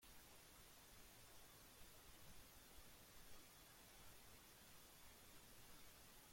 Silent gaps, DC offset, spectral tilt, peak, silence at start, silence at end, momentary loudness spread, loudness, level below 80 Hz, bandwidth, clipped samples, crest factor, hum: none; under 0.1%; -2 dB/octave; -48 dBFS; 0 s; 0 s; 0 LU; -64 LUFS; -74 dBFS; 16.5 kHz; under 0.1%; 16 dB; none